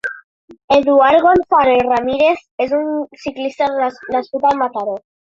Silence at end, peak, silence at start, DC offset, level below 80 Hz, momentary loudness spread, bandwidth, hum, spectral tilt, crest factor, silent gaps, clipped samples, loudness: 0.25 s; -2 dBFS; 0.05 s; under 0.1%; -50 dBFS; 13 LU; 7.6 kHz; none; -5.5 dB/octave; 14 dB; 0.24-0.48 s, 0.64-0.68 s, 2.51-2.58 s; under 0.1%; -15 LUFS